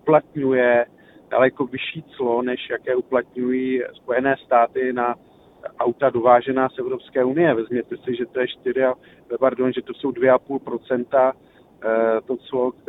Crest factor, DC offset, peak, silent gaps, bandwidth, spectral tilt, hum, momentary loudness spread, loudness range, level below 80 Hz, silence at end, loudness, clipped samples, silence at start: 20 dB; under 0.1%; -2 dBFS; none; 4 kHz; -9 dB/octave; none; 10 LU; 2 LU; -64 dBFS; 0.2 s; -21 LUFS; under 0.1%; 0.05 s